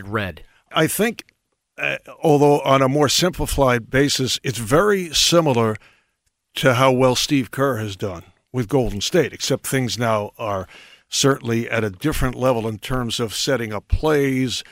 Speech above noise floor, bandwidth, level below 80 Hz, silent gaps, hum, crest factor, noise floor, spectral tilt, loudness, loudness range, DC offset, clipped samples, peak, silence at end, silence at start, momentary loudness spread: 52 dB; 16 kHz; -36 dBFS; none; none; 18 dB; -71 dBFS; -4.5 dB/octave; -19 LUFS; 5 LU; under 0.1%; under 0.1%; -2 dBFS; 0.1 s; 0 s; 11 LU